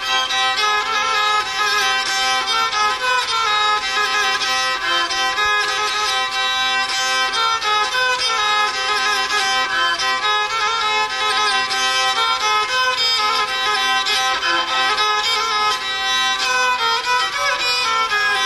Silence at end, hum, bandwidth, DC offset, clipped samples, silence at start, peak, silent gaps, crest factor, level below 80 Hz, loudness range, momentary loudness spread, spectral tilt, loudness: 0 s; none; 14 kHz; under 0.1%; under 0.1%; 0 s; -4 dBFS; none; 14 dB; -52 dBFS; 1 LU; 2 LU; 1 dB/octave; -16 LUFS